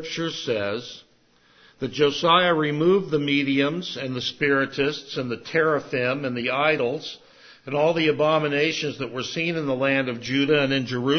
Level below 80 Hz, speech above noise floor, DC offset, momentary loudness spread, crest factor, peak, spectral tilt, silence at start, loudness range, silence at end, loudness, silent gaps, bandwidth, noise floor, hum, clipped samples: -64 dBFS; 36 dB; under 0.1%; 9 LU; 18 dB; -6 dBFS; -5.5 dB/octave; 0 s; 2 LU; 0 s; -23 LUFS; none; 6.6 kHz; -59 dBFS; none; under 0.1%